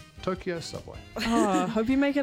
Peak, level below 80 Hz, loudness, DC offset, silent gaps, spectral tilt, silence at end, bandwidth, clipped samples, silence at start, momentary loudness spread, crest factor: -10 dBFS; -50 dBFS; -27 LUFS; under 0.1%; none; -5 dB/octave; 0 s; 16 kHz; under 0.1%; 0 s; 14 LU; 16 dB